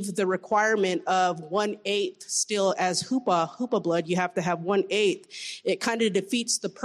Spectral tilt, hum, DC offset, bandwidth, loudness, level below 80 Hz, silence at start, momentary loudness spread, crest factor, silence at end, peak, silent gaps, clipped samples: -3.5 dB/octave; none; under 0.1%; 14 kHz; -26 LUFS; -74 dBFS; 0 s; 5 LU; 14 dB; 0 s; -12 dBFS; none; under 0.1%